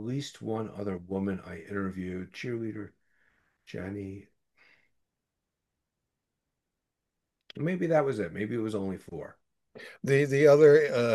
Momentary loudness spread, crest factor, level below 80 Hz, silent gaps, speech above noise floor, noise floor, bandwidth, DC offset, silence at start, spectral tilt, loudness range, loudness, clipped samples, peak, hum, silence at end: 23 LU; 22 dB; -72 dBFS; none; 58 dB; -86 dBFS; 12.5 kHz; under 0.1%; 0 s; -7 dB/octave; 20 LU; -28 LUFS; under 0.1%; -8 dBFS; none; 0 s